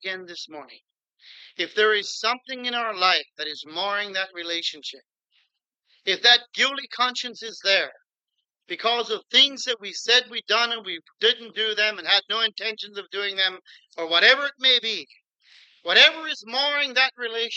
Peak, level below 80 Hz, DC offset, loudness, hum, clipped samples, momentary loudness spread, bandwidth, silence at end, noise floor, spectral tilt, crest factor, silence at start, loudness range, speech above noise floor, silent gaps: -2 dBFS; under -90 dBFS; under 0.1%; -21 LUFS; none; under 0.1%; 16 LU; 8.6 kHz; 0 s; -81 dBFS; 0 dB/octave; 22 dB; 0 s; 6 LU; 57 dB; none